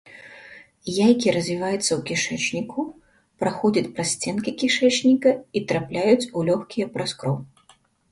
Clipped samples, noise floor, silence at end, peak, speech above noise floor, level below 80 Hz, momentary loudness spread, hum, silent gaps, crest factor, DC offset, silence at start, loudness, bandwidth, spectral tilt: under 0.1%; -58 dBFS; 0.65 s; -6 dBFS; 36 dB; -60 dBFS; 13 LU; none; none; 18 dB; under 0.1%; 0.1 s; -22 LUFS; 11.5 kHz; -4.5 dB/octave